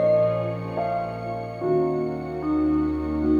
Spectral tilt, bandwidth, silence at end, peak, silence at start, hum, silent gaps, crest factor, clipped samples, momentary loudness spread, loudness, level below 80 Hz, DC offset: -9.5 dB/octave; 7 kHz; 0 s; -12 dBFS; 0 s; none; none; 12 dB; under 0.1%; 7 LU; -25 LUFS; -44 dBFS; under 0.1%